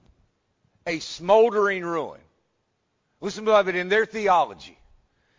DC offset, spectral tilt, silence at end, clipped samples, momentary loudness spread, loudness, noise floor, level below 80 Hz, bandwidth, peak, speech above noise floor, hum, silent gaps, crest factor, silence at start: under 0.1%; -4.5 dB/octave; 0.7 s; under 0.1%; 16 LU; -22 LUFS; -73 dBFS; -62 dBFS; 7.6 kHz; -6 dBFS; 51 dB; none; none; 18 dB; 0.85 s